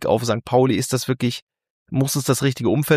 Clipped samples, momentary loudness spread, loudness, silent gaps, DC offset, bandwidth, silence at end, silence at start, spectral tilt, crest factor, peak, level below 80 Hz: under 0.1%; 7 LU; -21 LUFS; 1.42-1.47 s, 1.70-1.86 s; under 0.1%; 15.5 kHz; 0 s; 0 s; -5.5 dB/octave; 18 dB; -2 dBFS; -54 dBFS